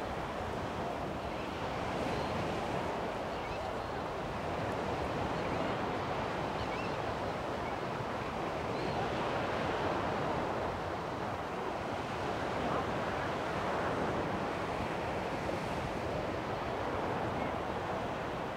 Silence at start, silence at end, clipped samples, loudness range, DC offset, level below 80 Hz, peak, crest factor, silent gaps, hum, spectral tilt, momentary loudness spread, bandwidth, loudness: 0 s; 0 s; under 0.1%; 2 LU; under 0.1%; -54 dBFS; -22 dBFS; 14 dB; none; none; -6 dB/octave; 4 LU; 16 kHz; -36 LUFS